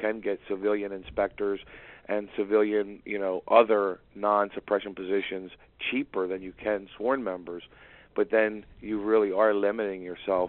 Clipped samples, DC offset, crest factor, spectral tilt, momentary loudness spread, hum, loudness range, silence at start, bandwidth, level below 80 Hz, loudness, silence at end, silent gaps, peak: under 0.1%; under 0.1%; 22 dB; -3 dB/octave; 12 LU; none; 5 LU; 0 s; 4.2 kHz; -60 dBFS; -28 LUFS; 0 s; none; -6 dBFS